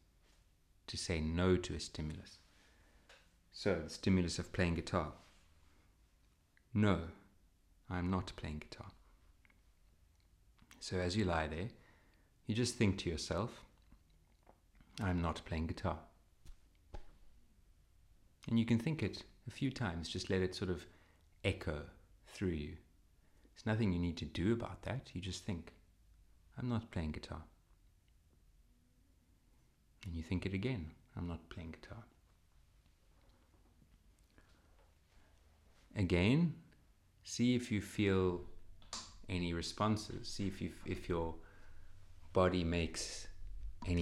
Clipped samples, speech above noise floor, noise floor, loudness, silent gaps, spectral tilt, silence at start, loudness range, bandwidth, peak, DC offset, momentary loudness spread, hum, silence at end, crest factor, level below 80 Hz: under 0.1%; 34 dB; -71 dBFS; -39 LUFS; none; -6 dB/octave; 0.9 s; 9 LU; 13 kHz; -18 dBFS; under 0.1%; 19 LU; none; 0 s; 22 dB; -58 dBFS